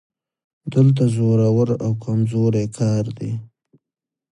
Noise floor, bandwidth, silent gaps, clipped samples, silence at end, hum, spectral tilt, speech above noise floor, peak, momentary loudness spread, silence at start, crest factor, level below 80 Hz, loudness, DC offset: -87 dBFS; 10.5 kHz; none; under 0.1%; 0.9 s; none; -8.5 dB/octave; 69 dB; -4 dBFS; 12 LU; 0.65 s; 16 dB; -54 dBFS; -19 LUFS; under 0.1%